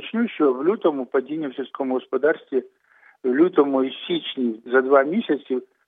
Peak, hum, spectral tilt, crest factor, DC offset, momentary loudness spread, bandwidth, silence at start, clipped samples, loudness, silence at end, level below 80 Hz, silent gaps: -2 dBFS; none; -8.5 dB/octave; 18 dB; under 0.1%; 11 LU; 4.4 kHz; 0 s; under 0.1%; -22 LUFS; 0.25 s; -86 dBFS; none